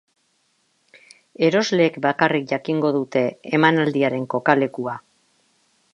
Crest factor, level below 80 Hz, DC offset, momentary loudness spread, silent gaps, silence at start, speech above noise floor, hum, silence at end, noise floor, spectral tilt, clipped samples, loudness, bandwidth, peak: 20 dB; -70 dBFS; under 0.1%; 7 LU; none; 1.4 s; 47 dB; none; 0.95 s; -66 dBFS; -6 dB/octave; under 0.1%; -20 LUFS; 10 kHz; 0 dBFS